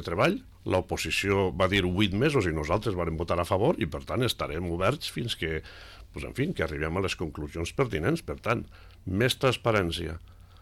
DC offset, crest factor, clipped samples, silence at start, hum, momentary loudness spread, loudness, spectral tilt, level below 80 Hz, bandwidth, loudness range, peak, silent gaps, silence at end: under 0.1%; 16 dB; under 0.1%; 0 s; none; 10 LU; -28 LUFS; -5.5 dB/octave; -44 dBFS; 16 kHz; 5 LU; -14 dBFS; none; 0.2 s